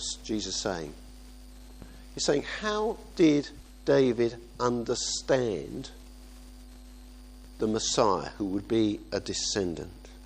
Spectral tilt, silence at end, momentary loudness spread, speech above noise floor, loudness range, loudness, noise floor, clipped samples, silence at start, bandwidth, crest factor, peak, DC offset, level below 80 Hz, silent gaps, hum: -4 dB/octave; 0 s; 23 LU; 19 dB; 5 LU; -29 LUFS; -47 dBFS; under 0.1%; 0 s; 15 kHz; 20 dB; -10 dBFS; under 0.1%; -48 dBFS; none; none